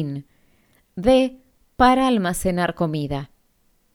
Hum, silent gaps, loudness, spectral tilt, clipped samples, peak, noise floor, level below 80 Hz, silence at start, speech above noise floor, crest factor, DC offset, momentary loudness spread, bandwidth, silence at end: none; none; -20 LUFS; -5.5 dB/octave; under 0.1%; -2 dBFS; -63 dBFS; -42 dBFS; 0 s; 43 dB; 20 dB; under 0.1%; 16 LU; 18 kHz; 0.7 s